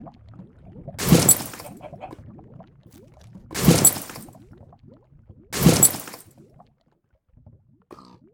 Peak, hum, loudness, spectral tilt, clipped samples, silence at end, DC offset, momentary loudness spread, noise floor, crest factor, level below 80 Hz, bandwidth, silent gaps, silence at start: 0 dBFS; none; -17 LUFS; -4 dB/octave; under 0.1%; 2.15 s; under 0.1%; 25 LU; -66 dBFS; 24 dB; -46 dBFS; over 20 kHz; none; 0 s